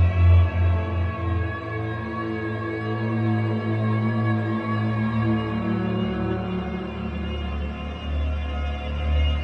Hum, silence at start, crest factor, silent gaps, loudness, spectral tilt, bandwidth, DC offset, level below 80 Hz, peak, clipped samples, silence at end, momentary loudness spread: none; 0 s; 16 dB; none; -25 LUFS; -9 dB/octave; 5.2 kHz; under 0.1%; -34 dBFS; -8 dBFS; under 0.1%; 0 s; 7 LU